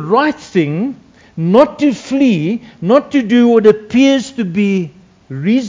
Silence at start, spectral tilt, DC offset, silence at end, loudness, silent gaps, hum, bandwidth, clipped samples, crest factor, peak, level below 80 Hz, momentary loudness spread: 0 s; -6.5 dB/octave; under 0.1%; 0 s; -13 LUFS; none; none; 7.6 kHz; 0.4%; 12 dB; 0 dBFS; -54 dBFS; 11 LU